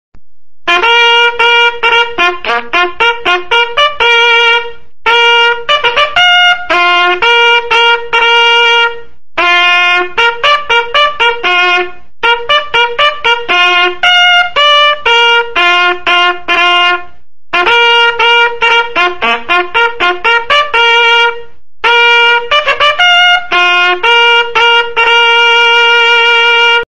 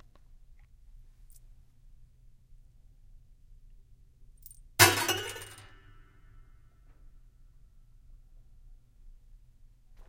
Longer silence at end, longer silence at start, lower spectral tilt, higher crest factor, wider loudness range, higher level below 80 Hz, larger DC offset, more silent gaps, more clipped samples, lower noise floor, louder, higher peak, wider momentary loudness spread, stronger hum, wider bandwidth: second, 0.15 s vs 1 s; second, 0.1 s vs 0.95 s; about the same, -1 dB/octave vs -2 dB/octave; second, 8 dB vs 32 dB; second, 2 LU vs 11 LU; first, -44 dBFS vs -56 dBFS; first, 4% vs under 0.1%; neither; neither; second, -52 dBFS vs -57 dBFS; first, -7 LUFS vs -25 LUFS; first, 0 dBFS vs -4 dBFS; second, 6 LU vs 31 LU; neither; second, 10.5 kHz vs 16.5 kHz